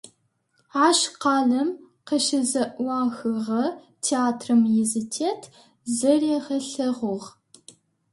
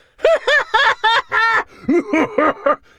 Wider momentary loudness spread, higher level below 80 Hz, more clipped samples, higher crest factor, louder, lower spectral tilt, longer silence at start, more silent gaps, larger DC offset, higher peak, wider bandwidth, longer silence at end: first, 10 LU vs 5 LU; second, -72 dBFS vs -50 dBFS; neither; about the same, 18 dB vs 16 dB; second, -23 LUFS vs -15 LUFS; about the same, -3.5 dB/octave vs -3.5 dB/octave; second, 0.05 s vs 0.2 s; neither; neither; second, -6 dBFS vs 0 dBFS; about the same, 11.5 kHz vs 12.5 kHz; first, 0.85 s vs 0.25 s